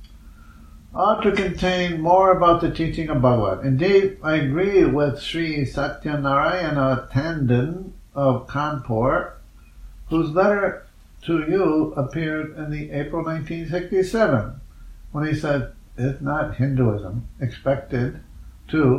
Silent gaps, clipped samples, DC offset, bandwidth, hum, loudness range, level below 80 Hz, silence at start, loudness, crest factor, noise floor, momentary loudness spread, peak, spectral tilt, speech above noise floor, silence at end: none; under 0.1%; under 0.1%; 12 kHz; none; 6 LU; -40 dBFS; 0 s; -21 LUFS; 18 dB; -44 dBFS; 11 LU; -4 dBFS; -7.5 dB/octave; 23 dB; 0 s